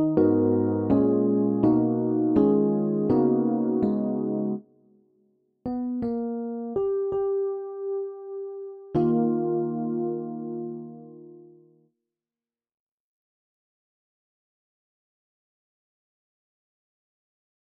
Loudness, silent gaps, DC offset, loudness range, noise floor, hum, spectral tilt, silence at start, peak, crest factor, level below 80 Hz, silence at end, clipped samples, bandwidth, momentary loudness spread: -25 LUFS; none; under 0.1%; 11 LU; under -90 dBFS; none; -11.5 dB/octave; 0 s; -8 dBFS; 18 dB; -60 dBFS; 6.35 s; under 0.1%; 4.7 kHz; 14 LU